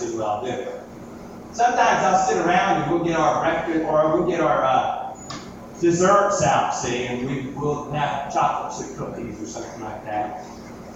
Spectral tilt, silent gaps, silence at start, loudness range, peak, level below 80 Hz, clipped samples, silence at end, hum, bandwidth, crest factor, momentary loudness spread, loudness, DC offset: -5 dB/octave; none; 0 s; 7 LU; -4 dBFS; -50 dBFS; under 0.1%; 0 s; none; 8.4 kHz; 18 dB; 17 LU; -21 LUFS; under 0.1%